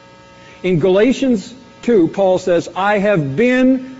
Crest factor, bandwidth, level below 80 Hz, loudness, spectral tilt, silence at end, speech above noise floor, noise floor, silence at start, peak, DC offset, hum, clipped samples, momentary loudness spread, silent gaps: 12 dB; 8 kHz; -48 dBFS; -15 LUFS; -5.5 dB/octave; 0 s; 27 dB; -41 dBFS; 0.65 s; -2 dBFS; under 0.1%; none; under 0.1%; 8 LU; none